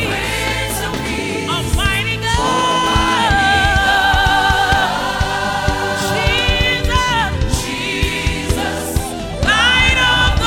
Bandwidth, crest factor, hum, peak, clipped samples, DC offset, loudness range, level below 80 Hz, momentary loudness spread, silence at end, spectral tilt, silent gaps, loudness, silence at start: 17.5 kHz; 14 dB; none; 0 dBFS; under 0.1%; under 0.1%; 3 LU; -24 dBFS; 8 LU; 0 s; -3.5 dB/octave; none; -15 LUFS; 0 s